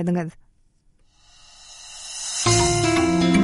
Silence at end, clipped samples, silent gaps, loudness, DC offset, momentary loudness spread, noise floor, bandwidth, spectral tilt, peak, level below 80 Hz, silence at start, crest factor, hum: 0 s; under 0.1%; none; -20 LUFS; under 0.1%; 21 LU; -59 dBFS; 11.5 kHz; -4 dB/octave; -6 dBFS; -42 dBFS; 0 s; 16 dB; none